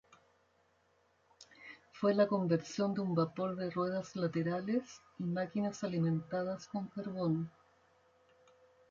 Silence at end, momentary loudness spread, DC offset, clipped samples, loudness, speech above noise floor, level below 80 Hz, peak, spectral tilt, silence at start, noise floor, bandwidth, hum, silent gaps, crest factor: 1.4 s; 11 LU; under 0.1%; under 0.1%; -36 LUFS; 38 dB; -76 dBFS; -18 dBFS; -7 dB/octave; 1.4 s; -73 dBFS; 7.6 kHz; none; none; 20 dB